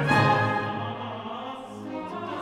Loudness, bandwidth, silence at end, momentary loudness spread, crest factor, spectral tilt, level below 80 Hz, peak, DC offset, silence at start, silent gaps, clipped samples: -27 LUFS; 14 kHz; 0 s; 16 LU; 18 dB; -6.5 dB/octave; -58 dBFS; -8 dBFS; under 0.1%; 0 s; none; under 0.1%